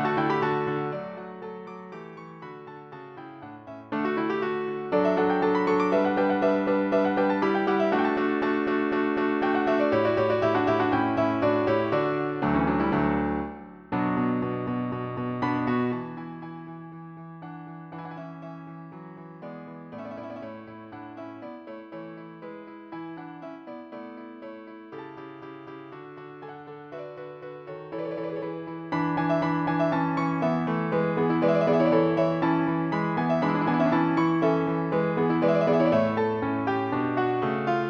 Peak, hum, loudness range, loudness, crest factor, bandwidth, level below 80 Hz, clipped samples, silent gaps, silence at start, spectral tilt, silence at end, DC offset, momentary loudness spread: -10 dBFS; none; 17 LU; -25 LUFS; 16 dB; 6.6 kHz; -56 dBFS; under 0.1%; none; 0 s; -8.5 dB/octave; 0 s; under 0.1%; 19 LU